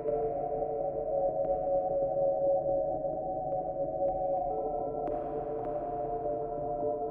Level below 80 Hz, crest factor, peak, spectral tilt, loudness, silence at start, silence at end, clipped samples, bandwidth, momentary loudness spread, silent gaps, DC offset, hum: -54 dBFS; 12 dB; -18 dBFS; -12 dB/octave; -32 LUFS; 0 s; 0 s; under 0.1%; 2.7 kHz; 6 LU; none; under 0.1%; none